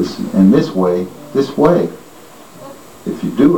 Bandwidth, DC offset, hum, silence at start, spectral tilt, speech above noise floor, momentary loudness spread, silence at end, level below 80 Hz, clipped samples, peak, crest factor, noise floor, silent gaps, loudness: 18 kHz; 0.6%; none; 0 s; -8 dB/octave; 26 dB; 24 LU; 0 s; -48 dBFS; under 0.1%; 0 dBFS; 14 dB; -39 dBFS; none; -15 LUFS